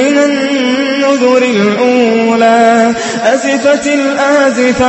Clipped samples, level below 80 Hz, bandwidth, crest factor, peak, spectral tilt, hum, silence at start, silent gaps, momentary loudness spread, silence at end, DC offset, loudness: 0.2%; -44 dBFS; 8.6 kHz; 10 dB; 0 dBFS; -4 dB/octave; none; 0 s; none; 4 LU; 0 s; under 0.1%; -9 LUFS